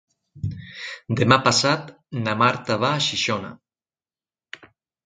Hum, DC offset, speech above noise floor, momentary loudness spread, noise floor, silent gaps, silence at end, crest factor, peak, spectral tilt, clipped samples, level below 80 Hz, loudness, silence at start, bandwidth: none; under 0.1%; over 69 dB; 23 LU; under -90 dBFS; none; 1.5 s; 24 dB; 0 dBFS; -4 dB/octave; under 0.1%; -52 dBFS; -21 LUFS; 0.35 s; 9.6 kHz